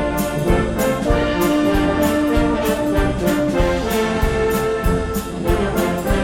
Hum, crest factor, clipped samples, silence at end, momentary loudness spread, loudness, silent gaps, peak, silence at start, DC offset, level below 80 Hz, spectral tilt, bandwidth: none; 14 dB; under 0.1%; 0 s; 3 LU; -18 LUFS; none; -4 dBFS; 0 s; under 0.1%; -26 dBFS; -6 dB/octave; 17 kHz